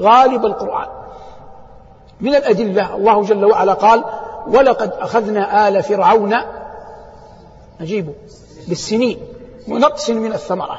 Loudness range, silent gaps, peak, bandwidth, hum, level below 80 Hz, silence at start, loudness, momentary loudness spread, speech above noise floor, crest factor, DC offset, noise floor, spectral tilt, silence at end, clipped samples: 7 LU; none; 0 dBFS; 8 kHz; none; -48 dBFS; 0 s; -15 LUFS; 19 LU; 27 dB; 16 dB; under 0.1%; -41 dBFS; -5.5 dB/octave; 0 s; under 0.1%